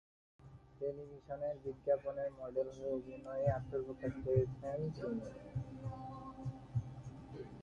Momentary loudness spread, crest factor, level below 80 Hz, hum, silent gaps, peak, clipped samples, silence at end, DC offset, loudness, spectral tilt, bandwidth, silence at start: 14 LU; 22 dB; -60 dBFS; none; none; -20 dBFS; under 0.1%; 0 s; under 0.1%; -42 LUFS; -9.5 dB/octave; 7.6 kHz; 0.4 s